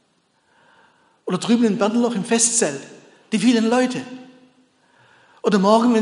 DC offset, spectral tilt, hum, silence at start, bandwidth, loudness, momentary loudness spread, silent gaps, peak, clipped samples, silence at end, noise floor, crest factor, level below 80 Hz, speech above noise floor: under 0.1%; -4 dB/octave; none; 1.25 s; 11 kHz; -19 LUFS; 16 LU; none; -2 dBFS; under 0.1%; 0 s; -64 dBFS; 18 dB; -72 dBFS; 46 dB